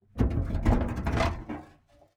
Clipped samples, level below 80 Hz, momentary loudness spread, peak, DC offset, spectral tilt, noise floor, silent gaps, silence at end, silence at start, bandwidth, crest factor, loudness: under 0.1%; -32 dBFS; 13 LU; -10 dBFS; under 0.1%; -7.5 dB/octave; -59 dBFS; none; 0.5 s; 0.15 s; 11.5 kHz; 18 dB; -29 LUFS